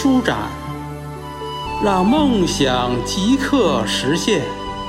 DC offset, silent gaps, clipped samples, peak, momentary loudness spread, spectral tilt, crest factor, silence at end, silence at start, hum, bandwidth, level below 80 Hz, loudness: under 0.1%; none; under 0.1%; -2 dBFS; 14 LU; -4.5 dB/octave; 16 dB; 0 s; 0 s; none; 15.5 kHz; -36 dBFS; -18 LUFS